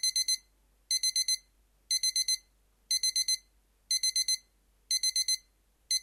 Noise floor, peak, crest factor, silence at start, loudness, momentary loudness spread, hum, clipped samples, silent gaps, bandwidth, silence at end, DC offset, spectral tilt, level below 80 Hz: -68 dBFS; -18 dBFS; 14 dB; 0.05 s; -29 LUFS; 6 LU; none; under 0.1%; none; 16.5 kHz; 0 s; under 0.1%; 6 dB/octave; -70 dBFS